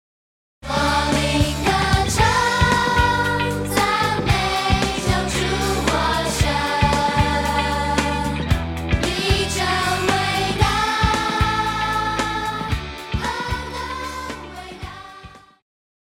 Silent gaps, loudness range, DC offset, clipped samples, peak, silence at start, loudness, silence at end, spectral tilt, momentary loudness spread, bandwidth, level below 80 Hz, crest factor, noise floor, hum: none; 7 LU; under 0.1%; under 0.1%; -4 dBFS; 0.65 s; -20 LUFS; 0.65 s; -4 dB/octave; 11 LU; 16.5 kHz; -30 dBFS; 16 dB; -43 dBFS; none